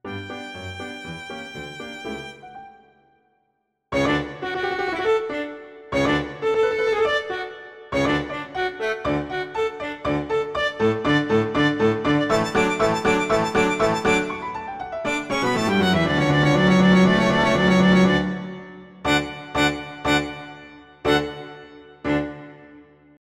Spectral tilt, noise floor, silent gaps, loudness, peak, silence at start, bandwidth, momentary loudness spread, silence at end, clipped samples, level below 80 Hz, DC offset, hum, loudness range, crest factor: -5.5 dB/octave; -72 dBFS; none; -21 LUFS; -4 dBFS; 0.05 s; 13.5 kHz; 17 LU; 0.4 s; under 0.1%; -46 dBFS; under 0.1%; none; 10 LU; 18 dB